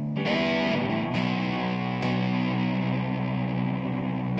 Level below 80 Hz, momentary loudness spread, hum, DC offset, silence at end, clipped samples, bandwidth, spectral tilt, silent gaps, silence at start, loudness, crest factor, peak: -56 dBFS; 4 LU; none; under 0.1%; 0 s; under 0.1%; 8 kHz; -7.5 dB/octave; none; 0 s; -27 LUFS; 14 dB; -14 dBFS